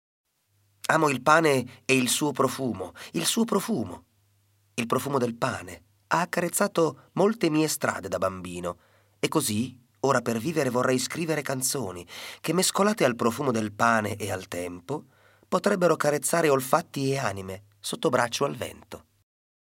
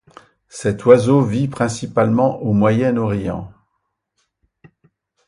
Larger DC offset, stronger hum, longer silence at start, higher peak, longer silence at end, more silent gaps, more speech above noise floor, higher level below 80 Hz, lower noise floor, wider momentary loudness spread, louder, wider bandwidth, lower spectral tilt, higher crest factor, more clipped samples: neither; neither; first, 0.9 s vs 0.55 s; second, -4 dBFS vs 0 dBFS; second, 0.8 s vs 1.8 s; neither; second, 43 dB vs 57 dB; second, -72 dBFS vs -48 dBFS; second, -69 dBFS vs -73 dBFS; about the same, 14 LU vs 14 LU; second, -26 LUFS vs -17 LUFS; first, 16.5 kHz vs 11.5 kHz; second, -4 dB/octave vs -7.5 dB/octave; about the same, 22 dB vs 18 dB; neither